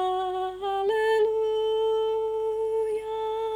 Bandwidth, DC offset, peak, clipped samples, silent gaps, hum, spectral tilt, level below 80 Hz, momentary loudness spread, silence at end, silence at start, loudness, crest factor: 11 kHz; under 0.1%; -14 dBFS; under 0.1%; none; 50 Hz at -60 dBFS; -4 dB/octave; -58 dBFS; 6 LU; 0 s; 0 s; -26 LUFS; 12 dB